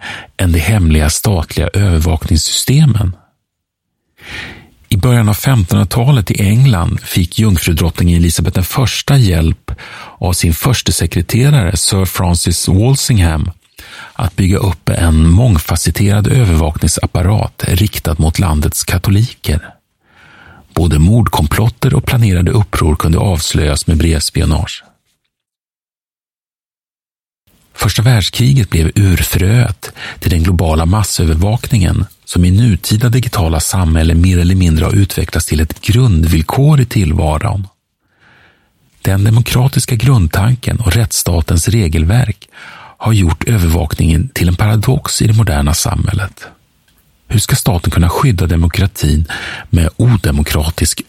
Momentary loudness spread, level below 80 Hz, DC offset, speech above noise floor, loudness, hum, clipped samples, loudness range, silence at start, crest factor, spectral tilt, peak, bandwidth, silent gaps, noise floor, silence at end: 7 LU; -22 dBFS; 0.2%; over 79 dB; -12 LUFS; none; under 0.1%; 3 LU; 0 s; 12 dB; -5.5 dB/octave; 0 dBFS; 16.5 kHz; 26.38-26.42 s; under -90 dBFS; 0.05 s